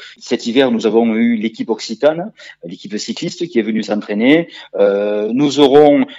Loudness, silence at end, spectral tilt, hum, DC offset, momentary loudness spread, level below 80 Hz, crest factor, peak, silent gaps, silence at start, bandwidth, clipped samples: -15 LUFS; 0 s; -5.5 dB/octave; none; under 0.1%; 15 LU; -60 dBFS; 14 dB; 0 dBFS; none; 0 s; 8 kHz; under 0.1%